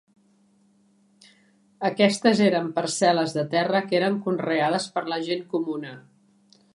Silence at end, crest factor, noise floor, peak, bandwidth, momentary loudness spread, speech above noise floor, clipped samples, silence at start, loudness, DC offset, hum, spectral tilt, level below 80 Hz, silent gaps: 0.75 s; 20 dB; -62 dBFS; -4 dBFS; 11.5 kHz; 9 LU; 39 dB; under 0.1%; 1.8 s; -23 LUFS; under 0.1%; none; -4.5 dB/octave; -74 dBFS; none